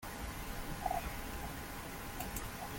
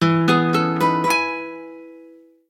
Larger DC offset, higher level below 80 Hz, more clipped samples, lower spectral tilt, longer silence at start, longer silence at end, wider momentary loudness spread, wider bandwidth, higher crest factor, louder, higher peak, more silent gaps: neither; first, -48 dBFS vs -62 dBFS; neither; second, -4 dB/octave vs -5.5 dB/octave; about the same, 0 s vs 0 s; second, 0 s vs 0.45 s; second, 6 LU vs 18 LU; about the same, 17 kHz vs 16.5 kHz; about the same, 20 dB vs 18 dB; second, -43 LUFS vs -19 LUFS; second, -22 dBFS vs -2 dBFS; neither